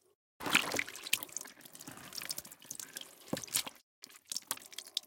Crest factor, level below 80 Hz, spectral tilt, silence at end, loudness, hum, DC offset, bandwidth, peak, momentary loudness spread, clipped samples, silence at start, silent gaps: 32 dB; -74 dBFS; -0.5 dB/octave; 0.05 s; -37 LUFS; none; under 0.1%; 17 kHz; -8 dBFS; 18 LU; under 0.1%; 0.4 s; 3.83-4.02 s